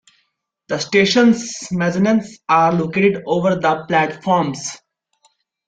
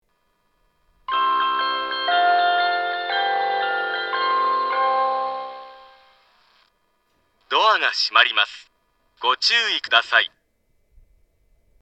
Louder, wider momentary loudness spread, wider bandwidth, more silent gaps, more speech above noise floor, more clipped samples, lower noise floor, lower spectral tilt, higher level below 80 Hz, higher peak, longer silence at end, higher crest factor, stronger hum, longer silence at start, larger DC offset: first, -17 LUFS vs -20 LUFS; about the same, 10 LU vs 9 LU; about the same, 9.2 kHz vs 8.6 kHz; neither; first, 53 dB vs 48 dB; neither; about the same, -69 dBFS vs -68 dBFS; first, -5 dB/octave vs 0.5 dB/octave; first, -56 dBFS vs -66 dBFS; about the same, -2 dBFS vs 0 dBFS; second, 0.9 s vs 1.55 s; second, 16 dB vs 22 dB; neither; second, 0.7 s vs 1.1 s; neither